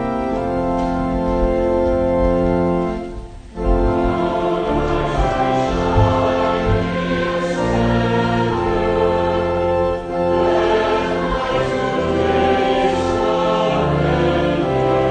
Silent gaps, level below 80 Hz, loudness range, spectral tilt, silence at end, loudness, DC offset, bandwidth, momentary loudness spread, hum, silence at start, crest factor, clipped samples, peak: none; -28 dBFS; 2 LU; -7 dB/octave; 0 s; -18 LUFS; under 0.1%; 9.6 kHz; 4 LU; none; 0 s; 14 dB; under 0.1%; -2 dBFS